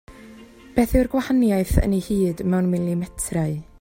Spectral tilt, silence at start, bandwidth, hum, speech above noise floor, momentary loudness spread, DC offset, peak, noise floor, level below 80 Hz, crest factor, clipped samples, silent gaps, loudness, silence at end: -6.5 dB/octave; 0.1 s; 16.5 kHz; none; 24 dB; 7 LU; under 0.1%; -2 dBFS; -44 dBFS; -32 dBFS; 18 dB; under 0.1%; none; -22 LUFS; 0.2 s